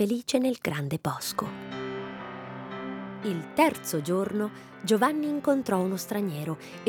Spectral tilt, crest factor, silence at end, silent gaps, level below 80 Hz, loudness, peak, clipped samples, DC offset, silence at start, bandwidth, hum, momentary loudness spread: -5 dB/octave; 20 dB; 0 s; none; -68 dBFS; -29 LUFS; -8 dBFS; under 0.1%; under 0.1%; 0 s; over 20 kHz; none; 12 LU